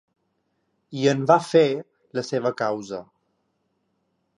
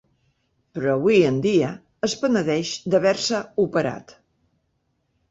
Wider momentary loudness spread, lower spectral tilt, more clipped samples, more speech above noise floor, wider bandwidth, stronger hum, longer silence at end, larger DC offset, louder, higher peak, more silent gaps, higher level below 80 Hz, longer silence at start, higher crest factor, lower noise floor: first, 17 LU vs 10 LU; about the same, -6 dB/octave vs -5 dB/octave; neither; about the same, 51 dB vs 50 dB; first, 11 kHz vs 8 kHz; neither; first, 1.35 s vs 1.2 s; neither; about the same, -22 LUFS vs -21 LUFS; about the same, -4 dBFS vs -6 dBFS; neither; second, -74 dBFS vs -60 dBFS; first, 0.9 s vs 0.75 s; about the same, 22 dB vs 18 dB; about the same, -73 dBFS vs -71 dBFS